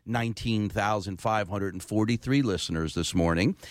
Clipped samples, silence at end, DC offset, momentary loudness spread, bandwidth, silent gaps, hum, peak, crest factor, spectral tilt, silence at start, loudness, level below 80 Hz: under 0.1%; 0 s; under 0.1%; 5 LU; 16 kHz; none; none; -14 dBFS; 14 dB; -5.5 dB/octave; 0.05 s; -28 LUFS; -46 dBFS